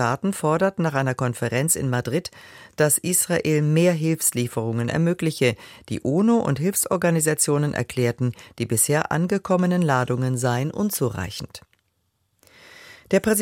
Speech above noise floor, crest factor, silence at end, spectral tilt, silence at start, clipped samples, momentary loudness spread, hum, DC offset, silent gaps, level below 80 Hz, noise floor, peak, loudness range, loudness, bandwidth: 49 dB; 18 dB; 0 s; -5 dB/octave; 0 s; under 0.1%; 8 LU; none; under 0.1%; none; -56 dBFS; -71 dBFS; -4 dBFS; 3 LU; -22 LUFS; 16.5 kHz